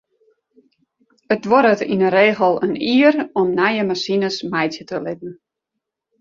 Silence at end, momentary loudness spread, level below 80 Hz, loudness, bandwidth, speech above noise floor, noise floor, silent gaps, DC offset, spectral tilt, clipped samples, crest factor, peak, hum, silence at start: 0.85 s; 12 LU; -64 dBFS; -17 LUFS; 7.6 kHz; 63 dB; -80 dBFS; none; under 0.1%; -5.5 dB/octave; under 0.1%; 18 dB; -2 dBFS; none; 1.3 s